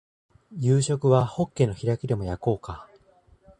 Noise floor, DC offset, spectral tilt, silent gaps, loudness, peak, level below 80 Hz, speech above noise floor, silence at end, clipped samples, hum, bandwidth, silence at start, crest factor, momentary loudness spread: -58 dBFS; under 0.1%; -7 dB/octave; none; -25 LUFS; -6 dBFS; -48 dBFS; 35 dB; 0.75 s; under 0.1%; none; 10.5 kHz; 0.5 s; 20 dB; 15 LU